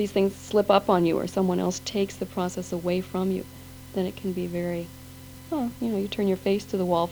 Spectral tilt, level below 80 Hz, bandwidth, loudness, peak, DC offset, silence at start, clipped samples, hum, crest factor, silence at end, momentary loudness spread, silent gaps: -6 dB/octave; -54 dBFS; over 20 kHz; -27 LUFS; -8 dBFS; under 0.1%; 0 s; under 0.1%; none; 18 dB; 0 s; 13 LU; none